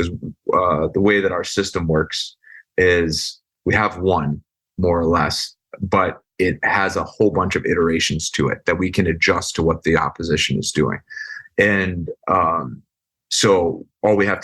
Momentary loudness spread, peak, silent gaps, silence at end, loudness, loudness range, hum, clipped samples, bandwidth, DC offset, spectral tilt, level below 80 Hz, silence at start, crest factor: 10 LU; -2 dBFS; none; 0 s; -19 LUFS; 2 LU; none; under 0.1%; 12.5 kHz; under 0.1%; -4.5 dB/octave; -44 dBFS; 0 s; 16 dB